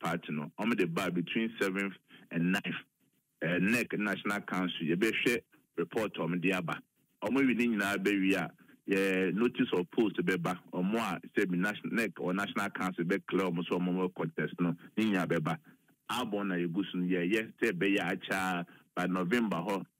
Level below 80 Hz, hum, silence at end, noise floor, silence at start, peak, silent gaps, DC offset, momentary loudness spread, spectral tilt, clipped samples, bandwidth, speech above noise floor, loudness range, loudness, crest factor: -74 dBFS; none; 0.15 s; -62 dBFS; 0 s; -14 dBFS; none; under 0.1%; 7 LU; -6 dB/octave; under 0.1%; 16 kHz; 30 dB; 3 LU; -32 LUFS; 18 dB